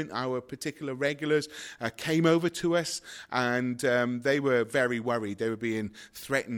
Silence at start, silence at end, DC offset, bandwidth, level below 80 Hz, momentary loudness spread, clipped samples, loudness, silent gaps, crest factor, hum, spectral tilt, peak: 0 s; 0 s; under 0.1%; 17 kHz; -66 dBFS; 10 LU; under 0.1%; -29 LUFS; none; 18 dB; none; -5 dB/octave; -12 dBFS